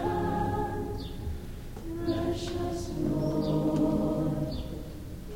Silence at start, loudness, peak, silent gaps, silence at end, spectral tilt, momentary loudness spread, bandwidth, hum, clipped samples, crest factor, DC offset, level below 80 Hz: 0 s; -31 LUFS; -16 dBFS; none; 0 s; -7.5 dB/octave; 13 LU; 16.5 kHz; none; under 0.1%; 14 dB; 0.2%; -40 dBFS